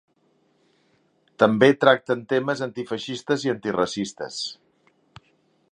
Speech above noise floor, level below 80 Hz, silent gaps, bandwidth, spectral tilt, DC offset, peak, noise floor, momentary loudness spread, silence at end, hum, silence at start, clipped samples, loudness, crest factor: 43 dB; -66 dBFS; none; 10.5 kHz; -5 dB/octave; under 0.1%; 0 dBFS; -65 dBFS; 14 LU; 1.2 s; none; 1.4 s; under 0.1%; -23 LUFS; 24 dB